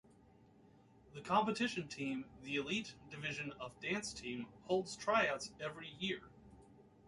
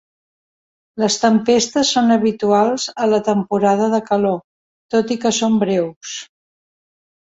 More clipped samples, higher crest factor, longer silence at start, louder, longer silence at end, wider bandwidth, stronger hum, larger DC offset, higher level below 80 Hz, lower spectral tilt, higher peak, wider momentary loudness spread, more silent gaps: neither; first, 22 dB vs 16 dB; about the same, 1.05 s vs 0.95 s; second, -40 LUFS vs -17 LUFS; second, 0 s vs 1.05 s; first, 11.5 kHz vs 8 kHz; neither; neither; second, -70 dBFS vs -60 dBFS; about the same, -4 dB/octave vs -4 dB/octave; second, -20 dBFS vs -2 dBFS; first, 12 LU vs 9 LU; second, none vs 4.44-4.89 s, 5.96-6.01 s